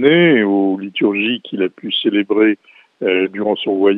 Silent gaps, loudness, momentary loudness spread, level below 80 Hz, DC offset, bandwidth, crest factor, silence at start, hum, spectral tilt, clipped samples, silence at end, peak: none; -16 LUFS; 9 LU; -68 dBFS; under 0.1%; 4.1 kHz; 16 dB; 0 s; none; -8.5 dB/octave; under 0.1%; 0 s; 0 dBFS